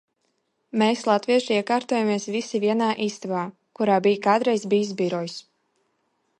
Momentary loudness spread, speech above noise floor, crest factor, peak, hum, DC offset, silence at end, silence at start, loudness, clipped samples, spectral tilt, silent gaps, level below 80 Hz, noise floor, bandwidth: 9 LU; 50 dB; 18 dB; -6 dBFS; none; under 0.1%; 1 s; 0.75 s; -23 LUFS; under 0.1%; -5 dB/octave; none; -74 dBFS; -73 dBFS; 11 kHz